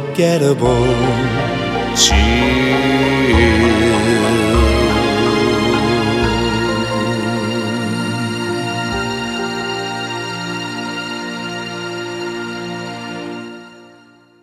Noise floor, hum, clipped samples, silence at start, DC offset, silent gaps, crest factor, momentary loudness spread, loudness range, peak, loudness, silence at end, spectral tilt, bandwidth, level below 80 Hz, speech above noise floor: -46 dBFS; none; under 0.1%; 0 s; under 0.1%; none; 16 dB; 12 LU; 10 LU; 0 dBFS; -16 LUFS; 0.55 s; -4.5 dB/octave; 15 kHz; -28 dBFS; 34 dB